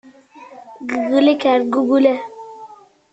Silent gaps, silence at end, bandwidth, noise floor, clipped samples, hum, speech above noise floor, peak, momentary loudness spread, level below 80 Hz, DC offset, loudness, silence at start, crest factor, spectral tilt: none; 0.4 s; 8 kHz; -42 dBFS; under 0.1%; none; 27 dB; -2 dBFS; 22 LU; -64 dBFS; under 0.1%; -16 LUFS; 0.4 s; 16 dB; -5 dB/octave